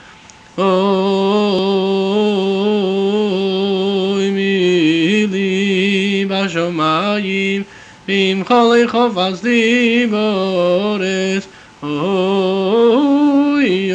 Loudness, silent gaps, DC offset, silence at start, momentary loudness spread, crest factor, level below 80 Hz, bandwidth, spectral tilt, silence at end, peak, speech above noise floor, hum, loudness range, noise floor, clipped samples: -15 LUFS; none; under 0.1%; 0.55 s; 6 LU; 14 dB; -58 dBFS; 8.8 kHz; -6 dB/octave; 0 s; -2 dBFS; 27 dB; none; 2 LU; -41 dBFS; under 0.1%